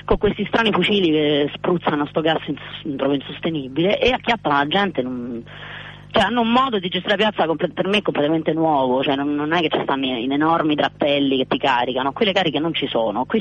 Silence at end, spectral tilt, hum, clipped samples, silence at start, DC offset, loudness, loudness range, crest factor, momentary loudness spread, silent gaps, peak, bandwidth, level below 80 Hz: 0 s; -6.5 dB/octave; 50 Hz at -45 dBFS; under 0.1%; 0.05 s; under 0.1%; -19 LUFS; 2 LU; 14 dB; 8 LU; none; -6 dBFS; 9.2 kHz; -44 dBFS